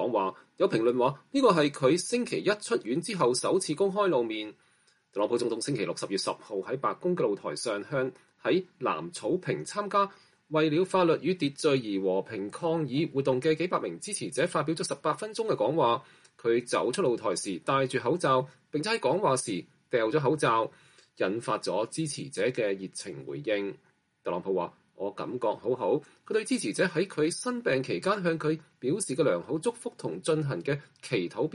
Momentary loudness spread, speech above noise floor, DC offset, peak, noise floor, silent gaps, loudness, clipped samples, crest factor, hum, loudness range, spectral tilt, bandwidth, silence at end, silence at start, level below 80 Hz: 9 LU; 38 dB; under 0.1%; -10 dBFS; -67 dBFS; none; -29 LUFS; under 0.1%; 18 dB; none; 5 LU; -5 dB/octave; 11.5 kHz; 0 s; 0 s; -74 dBFS